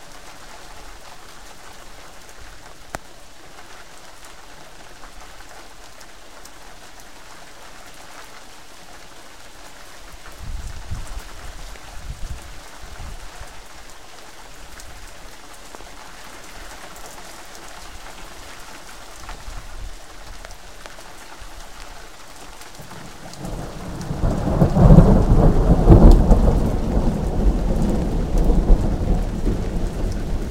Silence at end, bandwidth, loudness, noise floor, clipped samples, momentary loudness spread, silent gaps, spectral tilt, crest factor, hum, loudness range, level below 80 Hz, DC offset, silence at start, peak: 0 s; 14.5 kHz; -19 LUFS; -43 dBFS; under 0.1%; 24 LU; none; -7.5 dB/octave; 22 dB; none; 25 LU; -24 dBFS; 1%; 0.1 s; 0 dBFS